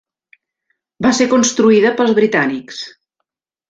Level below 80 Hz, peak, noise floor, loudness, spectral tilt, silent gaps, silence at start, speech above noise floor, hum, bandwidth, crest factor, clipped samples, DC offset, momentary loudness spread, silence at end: -56 dBFS; -2 dBFS; -76 dBFS; -13 LUFS; -4 dB/octave; none; 1 s; 63 dB; none; 9.2 kHz; 14 dB; under 0.1%; under 0.1%; 17 LU; 0.8 s